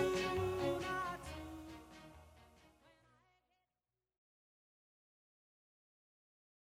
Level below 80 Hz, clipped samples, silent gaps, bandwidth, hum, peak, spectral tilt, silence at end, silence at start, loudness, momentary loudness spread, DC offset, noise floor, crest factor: -64 dBFS; under 0.1%; none; 16 kHz; none; -24 dBFS; -5 dB/octave; 4.25 s; 0 s; -41 LUFS; 21 LU; under 0.1%; under -90 dBFS; 22 dB